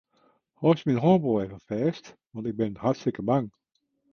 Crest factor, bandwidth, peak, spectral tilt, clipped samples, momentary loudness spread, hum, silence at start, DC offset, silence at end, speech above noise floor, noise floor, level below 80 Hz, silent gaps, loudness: 20 dB; 6.8 kHz; -8 dBFS; -8.5 dB/octave; under 0.1%; 14 LU; none; 0.6 s; under 0.1%; 0.65 s; 49 dB; -74 dBFS; -60 dBFS; none; -26 LUFS